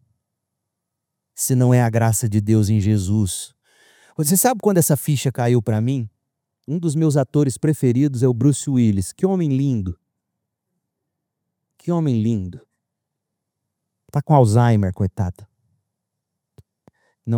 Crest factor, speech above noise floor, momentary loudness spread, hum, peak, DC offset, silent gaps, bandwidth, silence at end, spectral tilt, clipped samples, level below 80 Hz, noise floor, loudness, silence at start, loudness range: 20 dB; 63 dB; 12 LU; none; 0 dBFS; under 0.1%; none; over 20 kHz; 0 s; -6.5 dB/octave; under 0.1%; -56 dBFS; -80 dBFS; -19 LUFS; 1.35 s; 8 LU